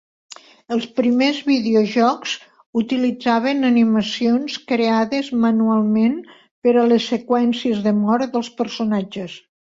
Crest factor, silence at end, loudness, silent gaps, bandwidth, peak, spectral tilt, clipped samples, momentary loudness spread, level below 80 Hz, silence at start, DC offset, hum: 14 dB; 0.3 s; -19 LUFS; 2.66-2.73 s, 6.51-6.62 s; 7.6 kHz; -4 dBFS; -5.5 dB/octave; under 0.1%; 9 LU; -62 dBFS; 0.7 s; under 0.1%; none